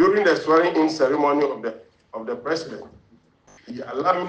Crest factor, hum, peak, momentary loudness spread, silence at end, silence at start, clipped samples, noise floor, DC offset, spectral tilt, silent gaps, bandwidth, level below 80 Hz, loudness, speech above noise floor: 16 dB; none; -6 dBFS; 19 LU; 0 s; 0 s; under 0.1%; -57 dBFS; under 0.1%; -5 dB/octave; none; 8.8 kHz; -64 dBFS; -21 LUFS; 36 dB